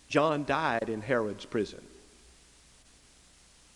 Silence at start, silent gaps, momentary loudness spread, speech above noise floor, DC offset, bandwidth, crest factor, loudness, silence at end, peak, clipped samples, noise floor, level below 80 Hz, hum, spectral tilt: 0.1 s; none; 8 LU; 29 dB; under 0.1%; 12 kHz; 24 dB; -30 LUFS; 1.8 s; -8 dBFS; under 0.1%; -59 dBFS; -62 dBFS; none; -5.5 dB/octave